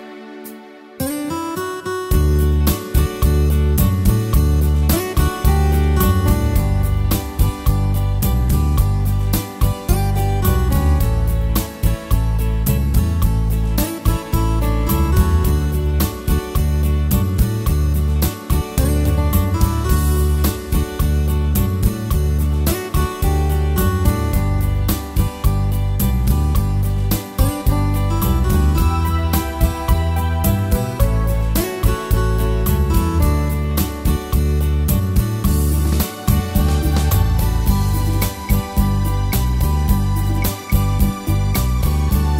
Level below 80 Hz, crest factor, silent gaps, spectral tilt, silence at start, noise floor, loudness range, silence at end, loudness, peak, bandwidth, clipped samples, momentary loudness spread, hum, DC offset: -20 dBFS; 14 dB; none; -6 dB/octave; 0 s; -38 dBFS; 2 LU; 0 s; -18 LUFS; -2 dBFS; 16.5 kHz; under 0.1%; 4 LU; none; under 0.1%